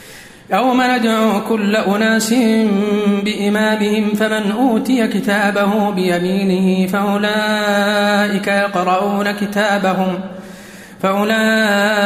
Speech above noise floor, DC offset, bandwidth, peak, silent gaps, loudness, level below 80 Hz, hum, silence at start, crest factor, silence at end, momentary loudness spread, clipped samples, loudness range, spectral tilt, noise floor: 21 dB; under 0.1%; 15.5 kHz; -2 dBFS; none; -15 LUFS; -56 dBFS; none; 0 s; 12 dB; 0 s; 4 LU; under 0.1%; 2 LU; -5 dB/octave; -35 dBFS